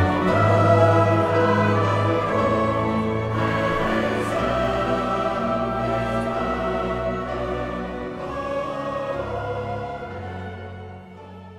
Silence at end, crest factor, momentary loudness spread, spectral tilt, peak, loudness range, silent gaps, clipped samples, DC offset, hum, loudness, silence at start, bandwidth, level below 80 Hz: 0 s; 18 dB; 15 LU; -7.5 dB/octave; -4 dBFS; 10 LU; none; under 0.1%; under 0.1%; none; -22 LUFS; 0 s; 11.5 kHz; -42 dBFS